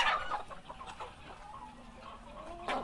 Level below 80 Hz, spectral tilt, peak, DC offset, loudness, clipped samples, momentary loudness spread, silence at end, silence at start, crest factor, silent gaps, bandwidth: -56 dBFS; -3 dB/octave; -16 dBFS; under 0.1%; -42 LUFS; under 0.1%; 15 LU; 0 s; 0 s; 24 dB; none; 11.5 kHz